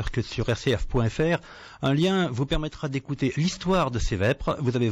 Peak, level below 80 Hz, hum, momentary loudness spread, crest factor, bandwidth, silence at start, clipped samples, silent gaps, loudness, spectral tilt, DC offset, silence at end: -14 dBFS; -36 dBFS; none; 6 LU; 10 dB; 10.5 kHz; 0 s; under 0.1%; none; -26 LUFS; -6 dB/octave; under 0.1%; 0 s